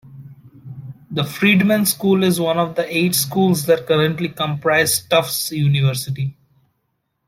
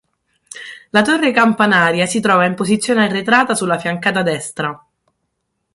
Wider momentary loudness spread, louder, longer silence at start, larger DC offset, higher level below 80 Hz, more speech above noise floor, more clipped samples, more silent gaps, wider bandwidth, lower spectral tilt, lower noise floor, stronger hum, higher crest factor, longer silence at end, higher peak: about the same, 11 LU vs 12 LU; about the same, -17 LUFS vs -15 LUFS; second, 0.05 s vs 0.55 s; neither; about the same, -58 dBFS vs -58 dBFS; about the same, 54 dB vs 57 dB; neither; neither; first, 16.5 kHz vs 11.5 kHz; about the same, -4.5 dB/octave vs -4 dB/octave; about the same, -71 dBFS vs -72 dBFS; neither; about the same, 16 dB vs 16 dB; about the same, 0.95 s vs 1 s; about the same, -2 dBFS vs 0 dBFS